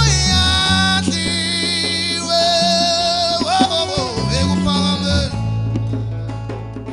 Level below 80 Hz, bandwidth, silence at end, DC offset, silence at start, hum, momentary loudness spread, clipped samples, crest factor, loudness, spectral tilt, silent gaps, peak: -30 dBFS; 14.5 kHz; 0 s; under 0.1%; 0 s; none; 10 LU; under 0.1%; 16 dB; -16 LUFS; -4 dB/octave; none; 0 dBFS